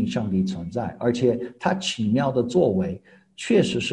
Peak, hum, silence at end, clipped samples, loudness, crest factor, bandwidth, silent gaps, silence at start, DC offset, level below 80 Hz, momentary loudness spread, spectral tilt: -6 dBFS; none; 0 s; under 0.1%; -23 LUFS; 16 dB; 10.5 kHz; none; 0 s; under 0.1%; -50 dBFS; 9 LU; -6 dB/octave